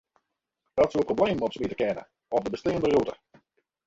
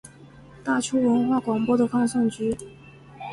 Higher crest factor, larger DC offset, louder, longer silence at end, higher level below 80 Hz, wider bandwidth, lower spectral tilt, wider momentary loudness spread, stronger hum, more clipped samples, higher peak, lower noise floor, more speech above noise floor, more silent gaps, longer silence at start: about the same, 18 dB vs 14 dB; neither; second, -27 LUFS vs -23 LUFS; first, 0.7 s vs 0 s; about the same, -56 dBFS vs -58 dBFS; second, 7.8 kHz vs 11.5 kHz; about the same, -6.5 dB/octave vs -5.5 dB/octave; second, 7 LU vs 13 LU; neither; neither; about the same, -10 dBFS vs -10 dBFS; first, -81 dBFS vs -47 dBFS; first, 55 dB vs 25 dB; neither; first, 0.75 s vs 0.05 s